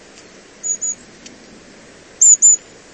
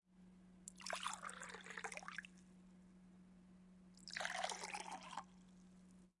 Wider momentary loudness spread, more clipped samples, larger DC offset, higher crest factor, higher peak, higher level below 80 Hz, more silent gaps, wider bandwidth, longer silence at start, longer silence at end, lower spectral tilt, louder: about the same, 18 LU vs 20 LU; neither; neither; second, 18 dB vs 28 dB; first, 0 dBFS vs -26 dBFS; first, -60 dBFS vs -78 dBFS; neither; second, 8.8 kHz vs 11.5 kHz; first, 0.65 s vs 0.1 s; first, 0.35 s vs 0.1 s; second, 1 dB/octave vs -1.5 dB/octave; first, -11 LUFS vs -49 LUFS